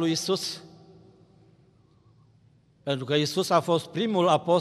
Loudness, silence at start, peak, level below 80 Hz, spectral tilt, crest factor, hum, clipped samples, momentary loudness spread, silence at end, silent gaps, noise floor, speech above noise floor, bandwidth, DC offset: -25 LUFS; 0 s; -8 dBFS; -72 dBFS; -5 dB/octave; 20 dB; none; under 0.1%; 11 LU; 0 s; none; -60 dBFS; 36 dB; 14.5 kHz; under 0.1%